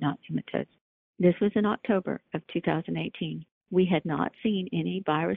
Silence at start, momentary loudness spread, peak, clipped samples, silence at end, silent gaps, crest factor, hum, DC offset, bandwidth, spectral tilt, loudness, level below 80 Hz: 0 s; 10 LU; -10 dBFS; under 0.1%; 0 s; 0.81-1.14 s, 3.51-3.61 s; 18 dB; none; under 0.1%; 4 kHz; -10.5 dB/octave; -29 LUFS; -64 dBFS